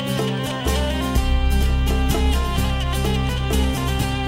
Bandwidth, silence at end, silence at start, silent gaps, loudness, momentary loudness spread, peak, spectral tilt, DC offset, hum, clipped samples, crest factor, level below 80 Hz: 16.5 kHz; 0 s; 0 s; none; -21 LUFS; 2 LU; -6 dBFS; -5.5 dB/octave; under 0.1%; none; under 0.1%; 12 dB; -22 dBFS